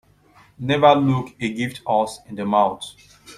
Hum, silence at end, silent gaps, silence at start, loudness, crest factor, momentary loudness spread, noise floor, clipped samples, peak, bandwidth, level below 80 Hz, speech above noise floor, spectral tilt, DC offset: 50 Hz at -55 dBFS; 0.05 s; none; 0.6 s; -20 LUFS; 20 dB; 15 LU; -53 dBFS; under 0.1%; -2 dBFS; 14.5 kHz; -58 dBFS; 33 dB; -6 dB/octave; under 0.1%